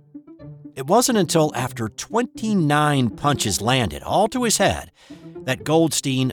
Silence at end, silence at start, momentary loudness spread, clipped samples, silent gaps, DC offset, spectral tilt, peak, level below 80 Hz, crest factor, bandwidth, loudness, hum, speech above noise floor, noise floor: 0 s; 0.15 s; 12 LU; under 0.1%; none; under 0.1%; -4.5 dB/octave; -6 dBFS; -48 dBFS; 16 dB; 19 kHz; -20 LUFS; none; 21 dB; -41 dBFS